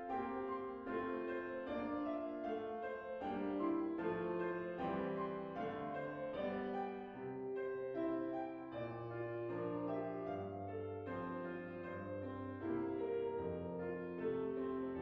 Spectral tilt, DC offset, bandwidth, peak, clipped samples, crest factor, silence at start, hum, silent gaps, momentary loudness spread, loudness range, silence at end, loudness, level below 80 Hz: -6.5 dB/octave; under 0.1%; 5.8 kHz; -28 dBFS; under 0.1%; 14 dB; 0 s; none; none; 5 LU; 3 LU; 0 s; -43 LUFS; -72 dBFS